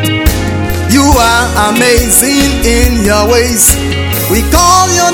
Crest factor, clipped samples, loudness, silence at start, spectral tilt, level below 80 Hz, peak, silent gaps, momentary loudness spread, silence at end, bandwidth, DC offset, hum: 8 dB; 1%; -8 LUFS; 0 s; -3.5 dB/octave; -16 dBFS; 0 dBFS; none; 6 LU; 0 s; over 20 kHz; under 0.1%; none